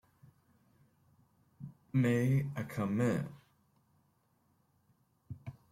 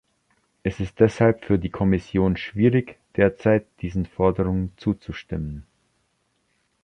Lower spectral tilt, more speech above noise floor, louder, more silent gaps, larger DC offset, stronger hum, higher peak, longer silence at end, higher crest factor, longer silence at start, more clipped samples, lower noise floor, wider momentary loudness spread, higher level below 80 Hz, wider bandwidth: about the same, -8 dB/octave vs -8.5 dB/octave; second, 42 dB vs 48 dB; second, -33 LUFS vs -23 LUFS; neither; neither; neither; second, -20 dBFS vs -4 dBFS; second, 0.2 s vs 1.2 s; about the same, 18 dB vs 20 dB; first, 1.6 s vs 0.65 s; neither; first, -74 dBFS vs -70 dBFS; first, 22 LU vs 12 LU; second, -70 dBFS vs -42 dBFS; first, 15.5 kHz vs 9.4 kHz